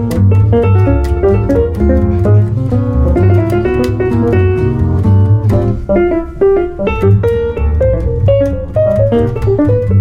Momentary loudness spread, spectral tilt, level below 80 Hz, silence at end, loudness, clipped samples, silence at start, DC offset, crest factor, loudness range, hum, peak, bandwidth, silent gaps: 4 LU; -10 dB/octave; -20 dBFS; 0 s; -12 LUFS; under 0.1%; 0 s; under 0.1%; 10 dB; 1 LU; none; 0 dBFS; 5.4 kHz; none